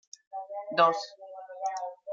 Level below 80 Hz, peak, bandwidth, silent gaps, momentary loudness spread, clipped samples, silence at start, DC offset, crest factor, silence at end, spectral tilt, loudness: under -90 dBFS; -10 dBFS; 7.6 kHz; none; 19 LU; under 0.1%; 0.3 s; under 0.1%; 22 dB; 0 s; -3 dB/octave; -29 LUFS